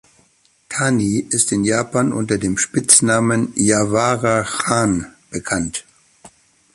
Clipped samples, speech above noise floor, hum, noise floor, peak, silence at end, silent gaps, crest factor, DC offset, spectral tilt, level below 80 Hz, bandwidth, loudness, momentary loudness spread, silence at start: under 0.1%; 41 dB; none; -58 dBFS; 0 dBFS; 0.45 s; none; 18 dB; under 0.1%; -4 dB/octave; -48 dBFS; 12.5 kHz; -17 LUFS; 12 LU; 0.7 s